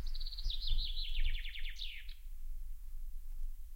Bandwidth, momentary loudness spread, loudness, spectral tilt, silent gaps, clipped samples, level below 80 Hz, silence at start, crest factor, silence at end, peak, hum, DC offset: 15.5 kHz; 13 LU; -44 LUFS; -2 dB/octave; none; under 0.1%; -38 dBFS; 0 s; 14 dB; 0 s; -22 dBFS; none; under 0.1%